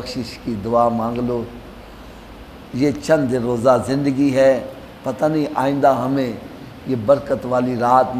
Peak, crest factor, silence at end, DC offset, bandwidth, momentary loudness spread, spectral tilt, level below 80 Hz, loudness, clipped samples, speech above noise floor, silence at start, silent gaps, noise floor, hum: 0 dBFS; 18 dB; 0 s; under 0.1%; 15 kHz; 22 LU; -7 dB/octave; -46 dBFS; -19 LUFS; under 0.1%; 20 dB; 0 s; none; -38 dBFS; none